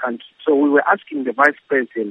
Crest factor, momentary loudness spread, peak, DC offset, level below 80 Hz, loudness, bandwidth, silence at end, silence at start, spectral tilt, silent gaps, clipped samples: 18 dB; 10 LU; 0 dBFS; under 0.1%; -78 dBFS; -18 LUFS; 8.6 kHz; 0 s; 0 s; -6 dB/octave; none; under 0.1%